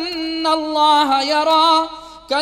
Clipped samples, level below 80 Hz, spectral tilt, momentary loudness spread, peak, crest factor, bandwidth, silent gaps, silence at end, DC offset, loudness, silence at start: under 0.1%; -54 dBFS; -1.5 dB/octave; 9 LU; -4 dBFS; 12 dB; 16 kHz; none; 0 s; under 0.1%; -15 LUFS; 0 s